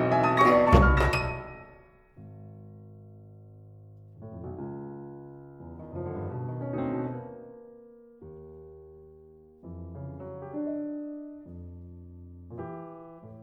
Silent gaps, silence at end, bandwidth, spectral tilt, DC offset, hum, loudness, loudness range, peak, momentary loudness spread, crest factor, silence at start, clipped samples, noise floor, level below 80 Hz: none; 0 s; 11.5 kHz; -7.5 dB/octave; under 0.1%; none; -28 LUFS; 18 LU; -4 dBFS; 29 LU; 28 dB; 0 s; under 0.1%; -55 dBFS; -38 dBFS